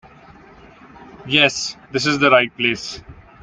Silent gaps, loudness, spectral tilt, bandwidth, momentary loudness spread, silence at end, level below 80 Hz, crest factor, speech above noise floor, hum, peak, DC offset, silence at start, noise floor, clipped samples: none; -17 LUFS; -3.5 dB/octave; 9.6 kHz; 17 LU; 0.3 s; -52 dBFS; 20 dB; 27 dB; none; 0 dBFS; under 0.1%; 1 s; -45 dBFS; under 0.1%